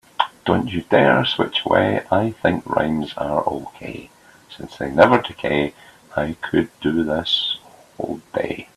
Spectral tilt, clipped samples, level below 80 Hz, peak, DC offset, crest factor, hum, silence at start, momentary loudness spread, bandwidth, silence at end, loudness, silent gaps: -6 dB/octave; under 0.1%; -50 dBFS; 0 dBFS; under 0.1%; 20 dB; none; 0.2 s; 15 LU; 13.5 kHz; 0.1 s; -20 LUFS; none